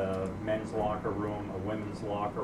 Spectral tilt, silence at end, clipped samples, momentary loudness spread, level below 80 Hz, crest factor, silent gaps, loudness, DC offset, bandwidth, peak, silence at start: -7.5 dB/octave; 0 s; under 0.1%; 4 LU; -52 dBFS; 14 dB; none; -34 LUFS; under 0.1%; 13 kHz; -20 dBFS; 0 s